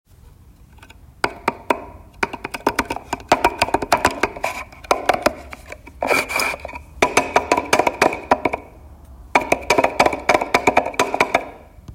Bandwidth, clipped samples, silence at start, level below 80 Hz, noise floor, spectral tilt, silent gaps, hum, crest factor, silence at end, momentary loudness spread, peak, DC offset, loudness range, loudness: 16.5 kHz; under 0.1%; 1.25 s; -44 dBFS; -46 dBFS; -3 dB/octave; none; none; 20 dB; 0 s; 11 LU; 0 dBFS; under 0.1%; 4 LU; -19 LUFS